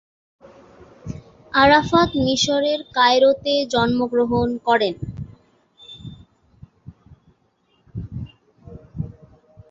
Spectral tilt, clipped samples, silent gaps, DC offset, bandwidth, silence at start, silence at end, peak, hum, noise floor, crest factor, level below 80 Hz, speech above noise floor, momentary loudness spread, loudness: -4.5 dB/octave; under 0.1%; none; under 0.1%; 7.8 kHz; 1.05 s; 0.6 s; -2 dBFS; none; -64 dBFS; 20 dB; -46 dBFS; 46 dB; 24 LU; -18 LUFS